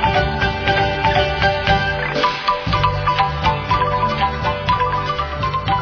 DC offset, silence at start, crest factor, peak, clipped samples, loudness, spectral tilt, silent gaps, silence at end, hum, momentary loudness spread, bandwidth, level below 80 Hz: under 0.1%; 0 s; 18 dB; 0 dBFS; under 0.1%; -18 LUFS; -6 dB/octave; none; 0 s; none; 4 LU; 5.4 kHz; -30 dBFS